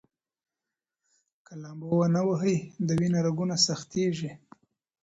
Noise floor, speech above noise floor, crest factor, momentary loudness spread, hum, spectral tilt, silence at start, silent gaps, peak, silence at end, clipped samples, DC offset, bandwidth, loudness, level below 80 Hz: -89 dBFS; 62 dB; 18 dB; 16 LU; none; -5.5 dB/octave; 1.5 s; none; -10 dBFS; 0.7 s; under 0.1%; under 0.1%; 8 kHz; -27 LUFS; -64 dBFS